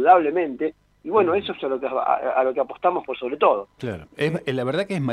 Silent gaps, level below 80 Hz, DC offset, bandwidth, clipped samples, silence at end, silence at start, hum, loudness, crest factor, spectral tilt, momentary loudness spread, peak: none; -62 dBFS; under 0.1%; 11 kHz; under 0.1%; 0 s; 0 s; none; -23 LUFS; 18 dB; -7 dB/octave; 9 LU; -4 dBFS